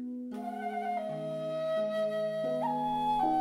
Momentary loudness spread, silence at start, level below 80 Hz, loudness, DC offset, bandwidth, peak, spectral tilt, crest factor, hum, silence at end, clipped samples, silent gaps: 8 LU; 0 s; -64 dBFS; -33 LUFS; under 0.1%; 15 kHz; -18 dBFS; -6.5 dB/octave; 14 dB; none; 0 s; under 0.1%; none